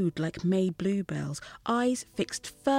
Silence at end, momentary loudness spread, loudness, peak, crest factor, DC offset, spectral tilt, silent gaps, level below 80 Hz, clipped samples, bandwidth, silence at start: 0 s; 7 LU; -30 LUFS; -12 dBFS; 16 dB; under 0.1%; -5.5 dB/octave; none; -60 dBFS; under 0.1%; 15.5 kHz; 0 s